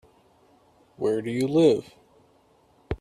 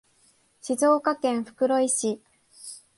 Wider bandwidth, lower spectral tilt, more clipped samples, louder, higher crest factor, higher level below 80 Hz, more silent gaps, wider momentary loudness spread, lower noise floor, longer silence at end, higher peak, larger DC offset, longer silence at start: first, 13.5 kHz vs 11.5 kHz; first, -7 dB/octave vs -3 dB/octave; neither; about the same, -24 LUFS vs -24 LUFS; about the same, 18 dB vs 16 dB; first, -52 dBFS vs -74 dBFS; neither; second, 10 LU vs 19 LU; about the same, -61 dBFS vs -63 dBFS; second, 0.05 s vs 0.2 s; about the same, -8 dBFS vs -10 dBFS; neither; first, 1 s vs 0.65 s